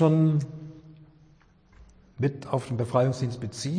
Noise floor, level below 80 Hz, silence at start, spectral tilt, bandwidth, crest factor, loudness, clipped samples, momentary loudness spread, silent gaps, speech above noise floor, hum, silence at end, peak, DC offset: -58 dBFS; -60 dBFS; 0 s; -7.5 dB/octave; 10.5 kHz; 18 dB; -27 LUFS; under 0.1%; 15 LU; none; 33 dB; none; 0 s; -10 dBFS; under 0.1%